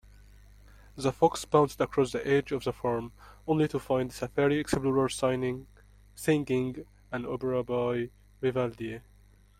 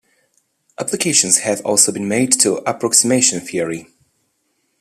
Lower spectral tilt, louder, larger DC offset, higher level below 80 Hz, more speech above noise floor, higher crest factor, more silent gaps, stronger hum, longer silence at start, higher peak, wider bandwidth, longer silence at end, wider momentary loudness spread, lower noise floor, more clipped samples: first, -6 dB/octave vs -2 dB/octave; second, -29 LUFS vs -14 LUFS; neither; first, -54 dBFS vs -62 dBFS; second, 29 dB vs 50 dB; about the same, 22 dB vs 18 dB; neither; first, 50 Hz at -55 dBFS vs none; first, 0.95 s vs 0.8 s; second, -8 dBFS vs 0 dBFS; first, 16 kHz vs 14.5 kHz; second, 0.6 s vs 0.95 s; about the same, 13 LU vs 11 LU; second, -58 dBFS vs -67 dBFS; neither